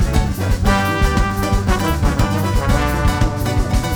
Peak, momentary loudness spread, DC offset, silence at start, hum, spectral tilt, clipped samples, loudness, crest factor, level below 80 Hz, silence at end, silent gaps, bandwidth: -2 dBFS; 2 LU; under 0.1%; 0 s; none; -5.5 dB/octave; under 0.1%; -18 LUFS; 14 dB; -20 dBFS; 0 s; none; over 20 kHz